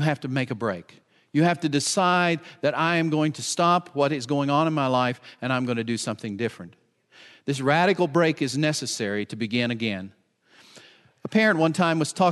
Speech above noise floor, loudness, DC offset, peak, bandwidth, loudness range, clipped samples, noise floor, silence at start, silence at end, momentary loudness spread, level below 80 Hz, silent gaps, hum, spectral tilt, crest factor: 33 dB; -24 LUFS; under 0.1%; -6 dBFS; 12 kHz; 4 LU; under 0.1%; -57 dBFS; 0 s; 0 s; 10 LU; -72 dBFS; none; none; -5 dB/octave; 18 dB